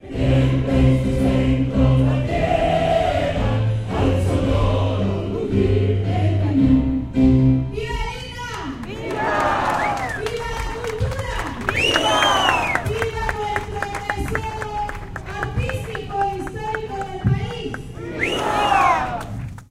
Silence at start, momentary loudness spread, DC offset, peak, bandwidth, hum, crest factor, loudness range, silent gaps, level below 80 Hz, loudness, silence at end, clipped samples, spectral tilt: 0.05 s; 12 LU; under 0.1%; 0 dBFS; 13.5 kHz; none; 20 dB; 7 LU; none; -30 dBFS; -20 LUFS; 0.05 s; under 0.1%; -6 dB/octave